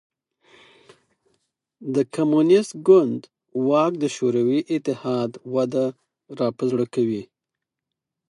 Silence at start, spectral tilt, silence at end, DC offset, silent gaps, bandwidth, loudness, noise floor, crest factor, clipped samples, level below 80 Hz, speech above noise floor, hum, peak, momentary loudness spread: 1.8 s; -6.5 dB/octave; 1.05 s; under 0.1%; none; 11 kHz; -22 LUFS; -85 dBFS; 20 dB; under 0.1%; -72 dBFS; 64 dB; none; -4 dBFS; 11 LU